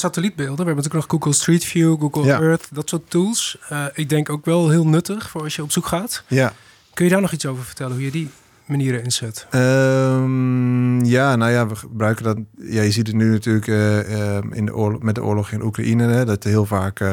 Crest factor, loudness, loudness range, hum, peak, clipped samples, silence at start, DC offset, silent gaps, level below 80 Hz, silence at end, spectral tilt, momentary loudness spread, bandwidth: 14 dB; -19 LUFS; 4 LU; none; -4 dBFS; under 0.1%; 0 s; under 0.1%; none; -56 dBFS; 0 s; -5.5 dB/octave; 9 LU; 18 kHz